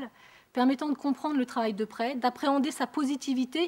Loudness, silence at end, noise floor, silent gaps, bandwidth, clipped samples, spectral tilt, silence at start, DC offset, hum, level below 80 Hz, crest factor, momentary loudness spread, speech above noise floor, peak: -29 LUFS; 0 s; -50 dBFS; none; 16 kHz; under 0.1%; -4 dB/octave; 0 s; under 0.1%; none; -76 dBFS; 16 dB; 5 LU; 21 dB; -14 dBFS